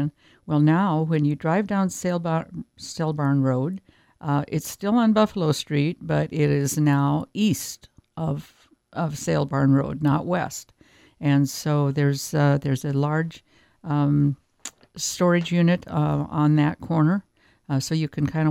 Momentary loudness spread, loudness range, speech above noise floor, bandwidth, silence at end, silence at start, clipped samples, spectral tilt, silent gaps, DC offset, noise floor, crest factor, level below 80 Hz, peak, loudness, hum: 12 LU; 3 LU; 21 dB; 16 kHz; 0 s; 0 s; under 0.1%; -6.5 dB/octave; none; under 0.1%; -43 dBFS; 18 dB; -56 dBFS; -6 dBFS; -23 LUFS; none